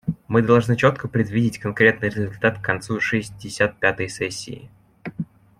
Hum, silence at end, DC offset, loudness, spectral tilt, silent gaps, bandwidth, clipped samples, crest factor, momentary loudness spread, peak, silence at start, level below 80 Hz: none; 0.35 s; under 0.1%; -21 LUFS; -6 dB/octave; none; 14 kHz; under 0.1%; 20 dB; 16 LU; -2 dBFS; 0.05 s; -52 dBFS